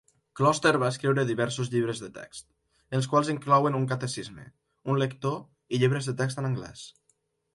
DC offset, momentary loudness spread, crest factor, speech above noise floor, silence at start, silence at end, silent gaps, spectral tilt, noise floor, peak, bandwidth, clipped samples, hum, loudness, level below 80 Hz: under 0.1%; 19 LU; 20 dB; 45 dB; 0.35 s; 0.65 s; none; -5.5 dB/octave; -72 dBFS; -8 dBFS; 11.5 kHz; under 0.1%; none; -27 LUFS; -64 dBFS